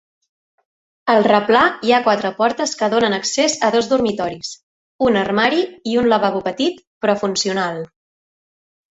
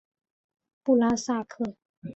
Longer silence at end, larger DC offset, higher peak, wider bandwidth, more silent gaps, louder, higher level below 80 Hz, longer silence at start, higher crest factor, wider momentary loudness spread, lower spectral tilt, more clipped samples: first, 1.05 s vs 0 s; neither; first, -2 dBFS vs -12 dBFS; about the same, 8.2 kHz vs 8.2 kHz; first, 4.63-4.99 s, 6.87-7.01 s vs 1.85-2.02 s; first, -17 LUFS vs -27 LUFS; first, -56 dBFS vs -64 dBFS; first, 1.05 s vs 0.85 s; about the same, 18 dB vs 18 dB; about the same, 10 LU vs 12 LU; second, -3.5 dB/octave vs -5 dB/octave; neither